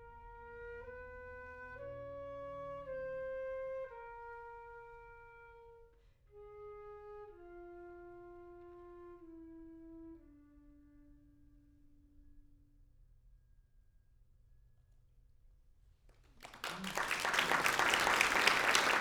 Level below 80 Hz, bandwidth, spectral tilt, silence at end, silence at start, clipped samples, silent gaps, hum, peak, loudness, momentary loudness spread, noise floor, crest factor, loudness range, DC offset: -64 dBFS; over 20 kHz; -1.5 dB/octave; 0 s; 0 s; under 0.1%; none; none; -10 dBFS; -35 LUFS; 26 LU; -67 dBFS; 32 dB; 23 LU; under 0.1%